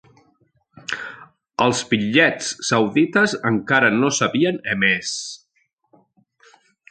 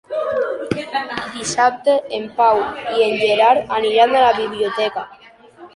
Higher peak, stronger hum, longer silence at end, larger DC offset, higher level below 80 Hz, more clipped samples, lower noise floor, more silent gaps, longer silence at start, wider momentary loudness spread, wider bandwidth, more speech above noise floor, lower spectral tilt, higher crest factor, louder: about the same, -2 dBFS vs -2 dBFS; neither; first, 1.55 s vs 0.1 s; neither; about the same, -60 dBFS vs -56 dBFS; neither; first, -68 dBFS vs -42 dBFS; neither; first, 0.9 s vs 0.1 s; first, 14 LU vs 10 LU; second, 9.4 kHz vs 11.5 kHz; first, 49 dB vs 26 dB; about the same, -4 dB/octave vs -3 dB/octave; about the same, 18 dB vs 16 dB; about the same, -19 LUFS vs -17 LUFS